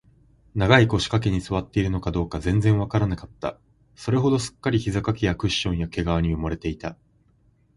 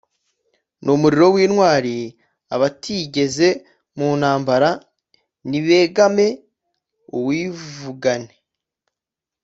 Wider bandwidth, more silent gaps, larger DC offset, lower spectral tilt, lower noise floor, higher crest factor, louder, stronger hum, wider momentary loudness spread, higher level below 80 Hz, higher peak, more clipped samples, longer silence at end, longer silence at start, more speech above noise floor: first, 11.5 kHz vs 8 kHz; neither; neither; about the same, -6 dB/octave vs -5.5 dB/octave; second, -61 dBFS vs -87 dBFS; about the same, 22 dB vs 18 dB; second, -23 LUFS vs -18 LUFS; neither; second, 13 LU vs 16 LU; first, -38 dBFS vs -60 dBFS; about the same, 0 dBFS vs 0 dBFS; neither; second, 0.85 s vs 1.15 s; second, 0.55 s vs 0.85 s; second, 38 dB vs 70 dB